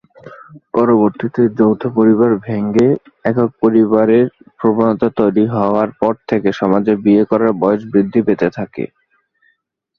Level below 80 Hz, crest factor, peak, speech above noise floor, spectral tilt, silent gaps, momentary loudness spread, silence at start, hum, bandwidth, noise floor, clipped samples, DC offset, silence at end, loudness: -52 dBFS; 14 dB; 0 dBFS; 50 dB; -9.5 dB/octave; none; 7 LU; 0.25 s; none; 6.8 kHz; -63 dBFS; under 0.1%; under 0.1%; 1.1 s; -14 LUFS